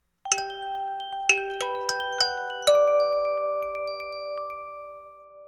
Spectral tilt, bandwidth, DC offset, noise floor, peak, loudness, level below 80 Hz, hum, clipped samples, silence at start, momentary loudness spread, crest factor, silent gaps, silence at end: 0.5 dB/octave; 14 kHz; under 0.1%; -47 dBFS; -4 dBFS; -26 LUFS; -64 dBFS; none; under 0.1%; 0.25 s; 15 LU; 24 dB; none; 0 s